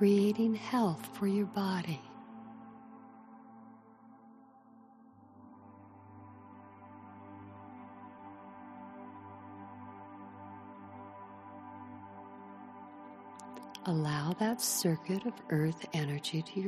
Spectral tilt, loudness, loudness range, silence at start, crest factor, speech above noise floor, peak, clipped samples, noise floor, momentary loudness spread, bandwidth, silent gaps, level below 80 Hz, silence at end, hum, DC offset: -5.5 dB/octave; -33 LUFS; 21 LU; 0 s; 20 dB; 27 dB; -18 dBFS; under 0.1%; -59 dBFS; 23 LU; 13 kHz; none; -78 dBFS; 0 s; none; under 0.1%